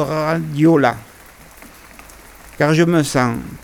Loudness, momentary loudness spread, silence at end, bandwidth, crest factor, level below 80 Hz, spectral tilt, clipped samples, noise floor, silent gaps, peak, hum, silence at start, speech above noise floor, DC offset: -16 LUFS; 7 LU; 0.05 s; 19 kHz; 18 dB; -46 dBFS; -6 dB/octave; under 0.1%; -42 dBFS; none; 0 dBFS; none; 0 s; 27 dB; under 0.1%